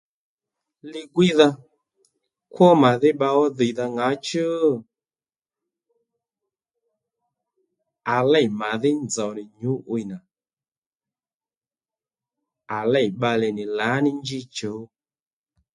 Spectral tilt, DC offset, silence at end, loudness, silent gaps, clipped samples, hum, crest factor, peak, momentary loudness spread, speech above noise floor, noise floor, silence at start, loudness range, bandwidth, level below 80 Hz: -5.5 dB/octave; under 0.1%; 0.9 s; -21 LUFS; 10.78-10.91 s, 11.34-11.40 s, 11.57-11.61 s; under 0.1%; none; 22 dB; -2 dBFS; 15 LU; over 69 dB; under -90 dBFS; 0.85 s; 12 LU; 11.5 kHz; -68 dBFS